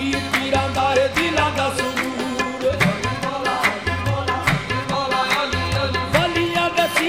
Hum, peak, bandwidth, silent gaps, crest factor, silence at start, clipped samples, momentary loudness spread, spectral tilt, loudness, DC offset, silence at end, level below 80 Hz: none; -4 dBFS; 16.5 kHz; none; 18 dB; 0 s; under 0.1%; 5 LU; -4.5 dB/octave; -20 LUFS; 0.2%; 0 s; -40 dBFS